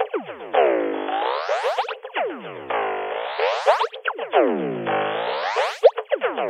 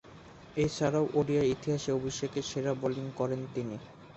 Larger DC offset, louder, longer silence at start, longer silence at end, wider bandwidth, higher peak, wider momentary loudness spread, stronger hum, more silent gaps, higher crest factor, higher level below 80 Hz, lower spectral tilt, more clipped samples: neither; first, -22 LUFS vs -32 LUFS; about the same, 0 s vs 0.05 s; about the same, 0 s vs 0 s; first, 11.5 kHz vs 8.2 kHz; first, -2 dBFS vs -16 dBFS; second, 8 LU vs 11 LU; neither; neither; about the same, 20 dB vs 16 dB; second, -76 dBFS vs -58 dBFS; second, -4.5 dB/octave vs -6 dB/octave; neither